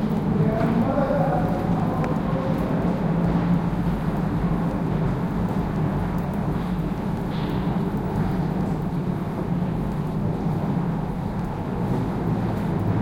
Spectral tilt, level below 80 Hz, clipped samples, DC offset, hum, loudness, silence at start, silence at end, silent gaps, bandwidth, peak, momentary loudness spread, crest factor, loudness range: -9 dB/octave; -36 dBFS; under 0.1%; under 0.1%; none; -24 LUFS; 0 s; 0 s; none; 16.5 kHz; -8 dBFS; 5 LU; 14 dB; 3 LU